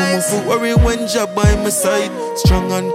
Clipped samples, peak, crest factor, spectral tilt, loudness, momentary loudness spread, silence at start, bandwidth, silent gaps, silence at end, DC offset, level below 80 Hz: under 0.1%; -2 dBFS; 14 dB; -5 dB/octave; -15 LUFS; 4 LU; 0 s; 16.5 kHz; none; 0 s; under 0.1%; -22 dBFS